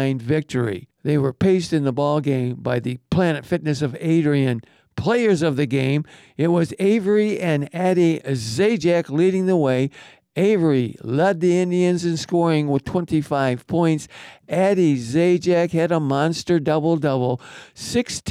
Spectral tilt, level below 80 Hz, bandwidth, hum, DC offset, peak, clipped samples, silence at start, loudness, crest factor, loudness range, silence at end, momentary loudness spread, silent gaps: -6.5 dB/octave; -54 dBFS; 13.5 kHz; none; under 0.1%; -8 dBFS; under 0.1%; 0 s; -20 LUFS; 10 dB; 2 LU; 0 s; 7 LU; none